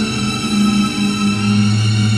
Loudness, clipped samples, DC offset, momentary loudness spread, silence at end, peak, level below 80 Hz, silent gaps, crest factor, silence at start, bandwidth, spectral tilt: -15 LUFS; under 0.1%; under 0.1%; 3 LU; 0 s; -4 dBFS; -40 dBFS; none; 10 dB; 0 s; 12.5 kHz; -5 dB/octave